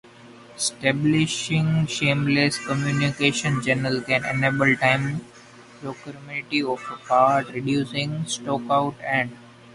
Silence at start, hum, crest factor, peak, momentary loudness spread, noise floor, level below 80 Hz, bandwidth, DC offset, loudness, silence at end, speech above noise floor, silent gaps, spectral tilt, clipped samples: 0.25 s; none; 18 dB; -4 dBFS; 12 LU; -47 dBFS; -56 dBFS; 11.5 kHz; under 0.1%; -22 LUFS; 0 s; 24 dB; none; -4.5 dB/octave; under 0.1%